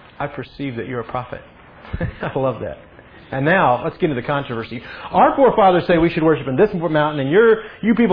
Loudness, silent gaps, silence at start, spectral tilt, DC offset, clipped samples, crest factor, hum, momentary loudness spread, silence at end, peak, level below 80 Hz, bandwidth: -18 LUFS; none; 0.2 s; -10 dB/octave; under 0.1%; under 0.1%; 16 dB; none; 16 LU; 0 s; -2 dBFS; -42 dBFS; 5.2 kHz